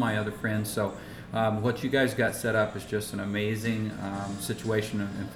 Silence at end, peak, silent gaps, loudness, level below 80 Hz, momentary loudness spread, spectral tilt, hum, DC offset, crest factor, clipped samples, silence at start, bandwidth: 0 s; -12 dBFS; none; -29 LUFS; -56 dBFS; 7 LU; -5.5 dB/octave; none; under 0.1%; 18 dB; under 0.1%; 0 s; 17 kHz